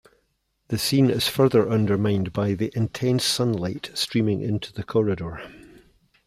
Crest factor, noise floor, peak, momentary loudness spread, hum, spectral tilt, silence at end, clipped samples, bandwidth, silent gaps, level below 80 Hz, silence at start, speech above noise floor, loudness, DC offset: 16 dB; -71 dBFS; -6 dBFS; 10 LU; none; -5.5 dB/octave; 0.7 s; under 0.1%; 16 kHz; none; -54 dBFS; 0.7 s; 49 dB; -23 LUFS; under 0.1%